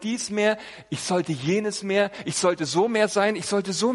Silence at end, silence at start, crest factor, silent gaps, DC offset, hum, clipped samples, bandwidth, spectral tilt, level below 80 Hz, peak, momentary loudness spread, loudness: 0 s; 0 s; 16 dB; none; under 0.1%; none; under 0.1%; 11.5 kHz; -4 dB/octave; -66 dBFS; -8 dBFS; 5 LU; -24 LUFS